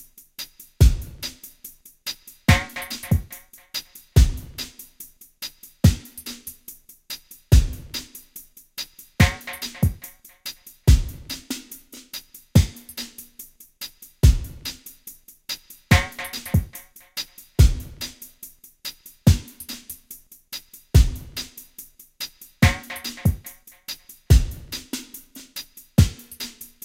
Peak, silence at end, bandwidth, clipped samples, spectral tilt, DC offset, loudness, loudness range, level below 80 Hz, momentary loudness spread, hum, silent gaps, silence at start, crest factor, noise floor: 0 dBFS; 0.2 s; 16.5 kHz; under 0.1%; -5 dB/octave; under 0.1%; -23 LUFS; 3 LU; -28 dBFS; 21 LU; none; none; 0.4 s; 22 dB; -46 dBFS